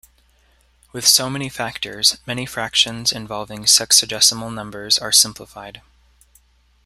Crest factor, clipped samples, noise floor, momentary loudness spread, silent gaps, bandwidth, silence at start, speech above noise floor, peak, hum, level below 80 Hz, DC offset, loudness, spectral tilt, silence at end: 20 dB; under 0.1%; -57 dBFS; 18 LU; none; 16 kHz; 0.95 s; 38 dB; 0 dBFS; none; -54 dBFS; under 0.1%; -16 LUFS; -0.5 dB/octave; 1.05 s